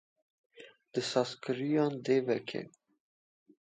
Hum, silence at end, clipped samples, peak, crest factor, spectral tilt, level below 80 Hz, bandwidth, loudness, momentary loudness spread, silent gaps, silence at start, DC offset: none; 1 s; under 0.1%; -14 dBFS; 20 dB; -5.5 dB/octave; -82 dBFS; 9.4 kHz; -33 LUFS; 11 LU; none; 0.6 s; under 0.1%